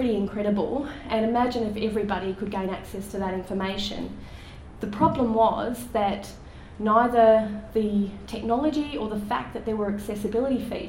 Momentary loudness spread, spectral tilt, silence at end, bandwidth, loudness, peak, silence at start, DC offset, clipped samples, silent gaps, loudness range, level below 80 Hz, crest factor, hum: 13 LU; -6.5 dB/octave; 0 s; 16.5 kHz; -26 LUFS; -8 dBFS; 0 s; under 0.1%; under 0.1%; none; 6 LU; -46 dBFS; 18 dB; none